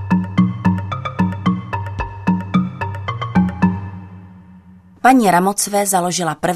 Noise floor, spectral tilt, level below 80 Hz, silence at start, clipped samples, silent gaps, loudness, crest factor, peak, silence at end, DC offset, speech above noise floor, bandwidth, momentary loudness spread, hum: -43 dBFS; -5.5 dB/octave; -42 dBFS; 0 s; under 0.1%; none; -17 LUFS; 18 dB; 0 dBFS; 0 s; under 0.1%; 29 dB; 14 kHz; 12 LU; none